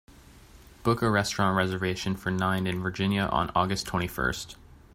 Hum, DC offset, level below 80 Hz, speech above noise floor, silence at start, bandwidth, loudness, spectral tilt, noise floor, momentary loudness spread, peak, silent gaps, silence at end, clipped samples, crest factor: none; under 0.1%; -48 dBFS; 25 dB; 0.3 s; 16 kHz; -27 LUFS; -5 dB/octave; -52 dBFS; 6 LU; -8 dBFS; none; 0.4 s; under 0.1%; 20 dB